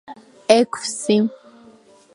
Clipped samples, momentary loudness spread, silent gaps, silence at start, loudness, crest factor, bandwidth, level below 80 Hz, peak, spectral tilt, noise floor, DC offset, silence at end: under 0.1%; 9 LU; none; 0.1 s; -19 LUFS; 20 dB; 11.5 kHz; -68 dBFS; 0 dBFS; -4 dB/octave; -49 dBFS; under 0.1%; 0.8 s